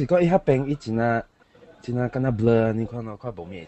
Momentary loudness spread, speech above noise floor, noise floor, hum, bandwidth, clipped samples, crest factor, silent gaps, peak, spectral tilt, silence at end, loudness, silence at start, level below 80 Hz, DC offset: 15 LU; 29 dB; -52 dBFS; none; 8.4 kHz; under 0.1%; 18 dB; none; -6 dBFS; -9 dB/octave; 0 s; -23 LUFS; 0 s; -48 dBFS; under 0.1%